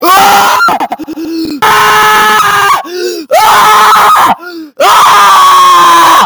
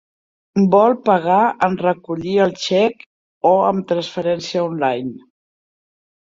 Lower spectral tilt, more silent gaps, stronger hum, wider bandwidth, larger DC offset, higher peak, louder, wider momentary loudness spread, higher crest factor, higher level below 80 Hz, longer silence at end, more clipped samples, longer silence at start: second, -1.5 dB/octave vs -6 dB/octave; second, none vs 3.06-3.41 s; neither; first, over 20 kHz vs 7.6 kHz; neither; about the same, 0 dBFS vs -2 dBFS; first, -4 LUFS vs -17 LUFS; first, 13 LU vs 8 LU; second, 4 dB vs 16 dB; first, -46 dBFS vs -60 dBFS; second, 0 s vs 1.2 s; first, 5% vs under 0.1%; second, 0 s vs 0.55 s